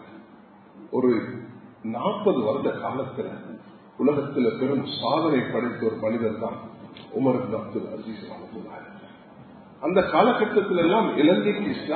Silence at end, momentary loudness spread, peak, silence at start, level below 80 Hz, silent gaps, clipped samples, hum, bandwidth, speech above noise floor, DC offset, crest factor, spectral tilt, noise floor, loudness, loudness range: 0 s; 19 LU; -6 dBFS; 0 s; -62 dBFS; none; under 0.1%; none; 4.5 kHz; 26 dB; under 0.1%; 20 dB; -11 dB/octave; -50 dBFS; -24 LUFS; 6 LU